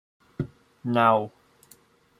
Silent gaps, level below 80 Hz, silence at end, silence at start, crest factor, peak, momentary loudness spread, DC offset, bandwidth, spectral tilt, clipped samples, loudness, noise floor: none; -62 dBFS; 0.9 s; 0.4 s; 22 dB; -6 dBFS; 18 LU; under 0.1%; 15 kHz; -7 dB/octave; under 0.1%; -25 LUFS; -58 dBFS